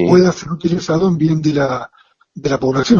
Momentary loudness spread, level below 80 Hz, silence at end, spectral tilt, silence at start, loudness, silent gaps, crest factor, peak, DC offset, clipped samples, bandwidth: 11 LU; -44 dBFS; 0 s; -6.5 dB/octave; 0 s; -16 LUFS; none; 14 dB; 0 dBFS; under 0.1%; under 0.1%; 7.4 kHz